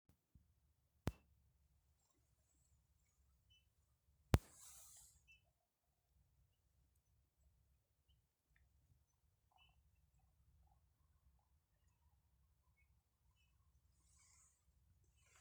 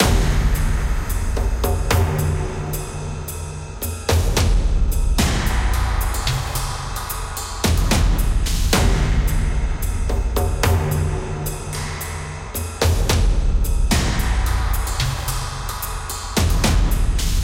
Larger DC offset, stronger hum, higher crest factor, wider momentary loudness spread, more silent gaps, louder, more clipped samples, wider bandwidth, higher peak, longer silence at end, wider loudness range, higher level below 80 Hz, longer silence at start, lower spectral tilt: neither; neither; first, 40 dB vs 18 dB; first, 22 LU vs 9 LU; neither; second, -45 LUFS vs -21 LUFS; neither; first, over 20 kHz vs 17 kHz; second, -16 dBFS vs 0 dBFS; first, 11 s vs 0 s; first, 10 LU vs 2 LU; second, -62 dBFS vs -20 dBFS; first, 1.05 s vs 0 s; first, -6 dB/octave vs -4.5 dB/octave